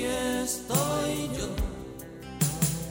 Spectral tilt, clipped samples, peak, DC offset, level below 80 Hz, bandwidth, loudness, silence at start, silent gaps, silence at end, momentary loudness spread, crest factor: -4.5 dB/octave; under 0.1%; -12 dBFS; under 0.1%; -42 dBFS; 17 kHz; -29 LUFS; 0 s; none; 0 s; 15 LU; 18 dB